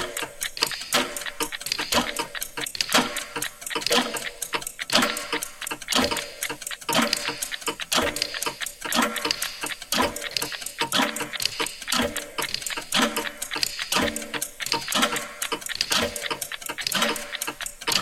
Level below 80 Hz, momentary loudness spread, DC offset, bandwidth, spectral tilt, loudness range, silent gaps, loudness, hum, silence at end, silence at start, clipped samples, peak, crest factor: -52 dBFS; 8 LU; under 0.1%; 16.5 kHz; -1 dB/octave; 1 LU; none; -25 LUFS; none; 0 s; 0 s; under 0.1%; -2 dBFS; 24 dB